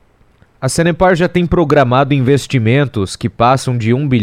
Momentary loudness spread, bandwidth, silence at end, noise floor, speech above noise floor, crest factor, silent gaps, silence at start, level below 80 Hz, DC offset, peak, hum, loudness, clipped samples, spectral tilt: 7 LU; 15 kHz; 0 s; -50 dBFS; 38 dB; 12 dB; none; 0.6 s; -34 dBFS; under 0.1%; 0 dBFS; none; -13 LUFS; under 0.1%; -6.5 dB/octave